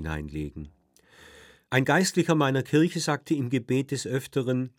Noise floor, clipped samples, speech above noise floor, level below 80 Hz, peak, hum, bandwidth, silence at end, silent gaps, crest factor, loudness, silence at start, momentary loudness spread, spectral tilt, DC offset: -56 dBFS; under 0.1%; 30 dB; -50 dBFS; -6 dBFS; none; 17.5 kHz; 0.1 s; none; 20 dB; -26 LUFS; 0 s; 13 LU; -5.5 dB/octave; under 0.1%